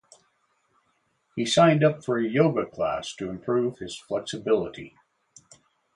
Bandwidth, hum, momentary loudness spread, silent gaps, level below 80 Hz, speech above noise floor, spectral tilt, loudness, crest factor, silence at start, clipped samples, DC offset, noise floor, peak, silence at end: 11.5 kHz; none; 17 LU; none; -62 dBFS; 47 dB; -5.5 dB/octave; -25 LUFS; 20 dB; 1.35 s; under 0.1%; under 0.1%; -71 dBFS; -6 dBFS; 1.05 s